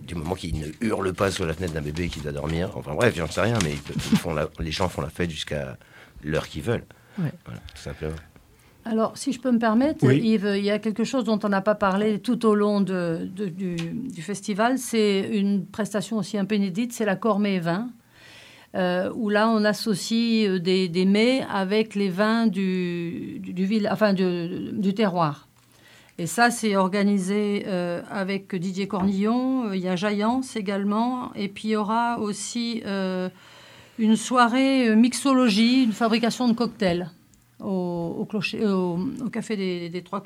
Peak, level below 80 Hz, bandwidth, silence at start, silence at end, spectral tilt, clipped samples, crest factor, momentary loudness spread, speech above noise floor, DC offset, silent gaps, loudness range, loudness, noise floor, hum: -4 dBFS; -50 dBFS; 15.5 kHz; 0 s; 0 s; -5.5 dB/octave; under 0.1%; 20 dB; 11 LU; 30 dB; under 0.1%; none; 6 LU; -24 LUFS; -54 dBFS; none